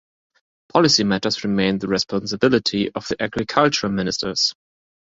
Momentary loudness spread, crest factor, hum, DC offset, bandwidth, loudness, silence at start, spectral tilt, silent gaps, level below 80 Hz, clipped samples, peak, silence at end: 8 LU; 20 dB; none; under 0.1%; 7.8 kHz; -20 LUFS; 0.75 s; -4 dB/octave; none; -52 dBFS; under 0.1%; -2 dBFS; 0.6 s